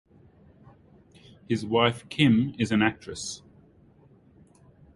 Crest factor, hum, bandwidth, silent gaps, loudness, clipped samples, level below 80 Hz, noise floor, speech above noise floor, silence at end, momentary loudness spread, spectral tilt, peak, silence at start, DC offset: 22 dB; none; 11.5 kHz; none; -25 LUFS; under 0.1%; -58 dBFS; -57 dBFS; 32 dB; 1.6 s; 14 LU; -5.5 dB/octave; -6 dBFS; 1.5 s; under 0.1%